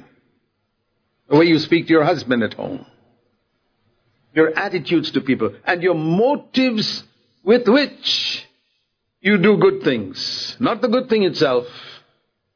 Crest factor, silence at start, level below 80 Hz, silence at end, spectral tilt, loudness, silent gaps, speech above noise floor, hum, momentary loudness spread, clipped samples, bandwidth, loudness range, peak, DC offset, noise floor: 18 dB; 1.3 s; -66 dBFS; 0.6 s; -6 dB/octave; -18 LUFS; none; 53 dB; none; 10 LU; under 0.1%; 5.4 kHz; 3 LU; -2 dBFS; under 0.1%; -71 dBFS